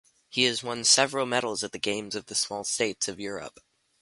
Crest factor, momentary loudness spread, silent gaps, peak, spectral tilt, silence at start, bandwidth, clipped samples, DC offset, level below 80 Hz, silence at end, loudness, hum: 24 dB; 14 LU; none; -6 dBFS; -1.5 dB/octave; 0.3 s; 11.5 kHz; under 0.1%; under 0.1%; -68 dBFS; 0.5 s; -26 LUFS; none